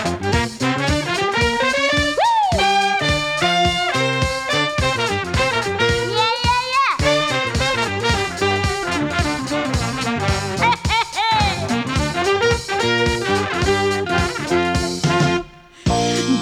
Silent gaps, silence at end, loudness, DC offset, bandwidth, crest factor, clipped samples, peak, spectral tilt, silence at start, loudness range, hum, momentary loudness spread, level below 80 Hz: none; 0 s; -18 LUFS; under 0.1%; 17 kHz; 16 dB; under 0.1%; -4 dBFS; -4 dB/octave; 0 s; 2 LU; none; 4 LU; -34 dBFS